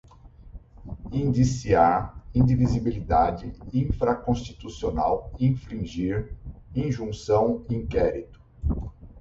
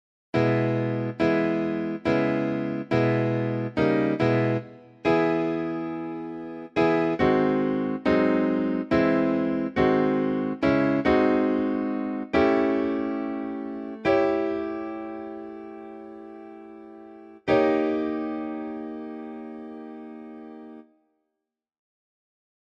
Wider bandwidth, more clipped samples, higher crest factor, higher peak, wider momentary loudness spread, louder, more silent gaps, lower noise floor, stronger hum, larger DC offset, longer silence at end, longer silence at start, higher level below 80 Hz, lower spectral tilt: about the same, 7.8 kHz vs 7.4 kHz; neither; about the same, 18 dB vs 18 dB; about the same, -8 dBFS vs -8 dBFS; second, 14 LU vs 19 LU; about the same, -25 LUFS vs -25 LUFS; neither; second, -48 dBFS vs -84 dBFS; neither; neither; second, 0 s vs 1.95 s; about the same, 0.25 s vs 0.35 s; first, -38 dBFS vs -56 dBFS; about the same, -8 dB/octave vs -8.5 dB/octave